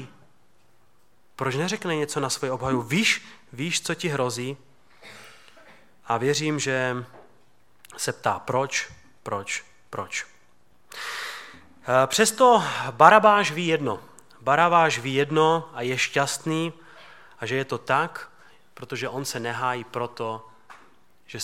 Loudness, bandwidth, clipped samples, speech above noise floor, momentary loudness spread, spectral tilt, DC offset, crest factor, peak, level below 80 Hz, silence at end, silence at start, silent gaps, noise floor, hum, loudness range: -24 LUFS; 16.5 kHz; under 0.1%; 41 dB; 20 LU; -3.5 dB/octave; 0.2%; 26 dB; 0 dBFS; -66 dBFS; 0 s; 0 s; none; -65 dBFS; none; 10 LU